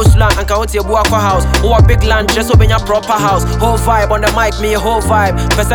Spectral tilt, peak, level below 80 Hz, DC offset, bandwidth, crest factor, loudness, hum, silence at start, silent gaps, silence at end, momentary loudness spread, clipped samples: -5 dB/octave; 0 dBFS; -16 dBFS; under 0.1%; 19 kHz; 10 dB; -11 LUFS; none; 0 s; none; 0 s; 4 LU; under 0.1%